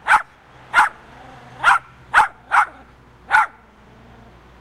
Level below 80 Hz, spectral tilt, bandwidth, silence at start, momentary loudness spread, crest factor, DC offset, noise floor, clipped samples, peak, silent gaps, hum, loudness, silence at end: -52 dBFS; -1.5 dB/octave; 15 kHz; 0.05 s; 6 LU; 20 dB; under 0.1%; -47 dBFS; under 0.1%; 0 dBFS; none; none; -18 LUFS; 1.15 s